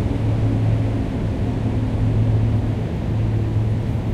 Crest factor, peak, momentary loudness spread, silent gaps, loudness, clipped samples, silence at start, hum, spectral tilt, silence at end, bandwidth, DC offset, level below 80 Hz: 12 dB; -8 dBFS; 4 LU; none; -21 LUFS; under 0.1%; 0 s; none; -9 dB/octave; 0 s; 6.6 kHz; under 0.1%; -28 dBFS